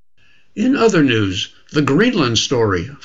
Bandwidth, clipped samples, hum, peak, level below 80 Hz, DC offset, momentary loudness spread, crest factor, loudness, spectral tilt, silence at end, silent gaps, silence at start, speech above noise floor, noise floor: 8 kHz; under 0.1%; none; -2 dBFS; -48 dBFS; 0.7%; 8 LU; 16 dB; -16 LUFS; -5 dB/octave; 0.1 s; none; 0.55 s; 41 dB; -57 dBFS